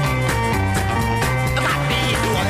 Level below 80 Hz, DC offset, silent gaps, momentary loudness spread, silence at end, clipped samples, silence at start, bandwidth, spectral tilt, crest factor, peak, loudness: -30 dBFS; under 0.1%; none; 1 LU; 0 s; under 0.1%; 0 s; 16 kHz; -5 dB/octave; 12 dB; -6 dBFS; -19 LUFS